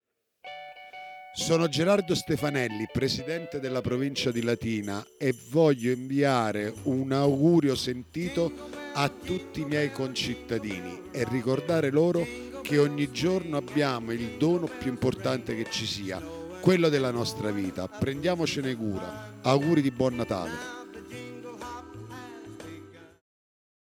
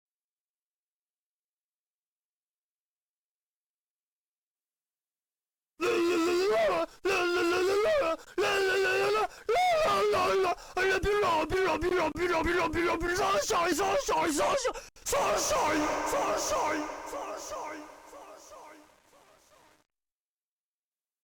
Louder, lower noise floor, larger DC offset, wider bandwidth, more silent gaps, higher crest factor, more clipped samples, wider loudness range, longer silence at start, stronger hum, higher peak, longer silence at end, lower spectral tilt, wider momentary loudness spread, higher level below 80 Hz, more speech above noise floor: about the same, -28 LUFS vs -28 LUFS; second, -50 dBFS vs under -90 dBFS; neither; about the same, 18 kHz vs 17.5 kHz; neither; first, 20 dB vs 12 dB; neither; second, 5 LU vs 10 LU; second, 0.45 s vs 5.8 s; neither; first, -8 dBFS vs -18 dBFS; second, 0.95 s vs 2.5 s; first, -5.5 dB/octave vs -3 dB/octave; first, 18 LU vs 12 LU; about the same, -56 dBFS vs -52 dBFS; second, 23 dB vs over 61 dB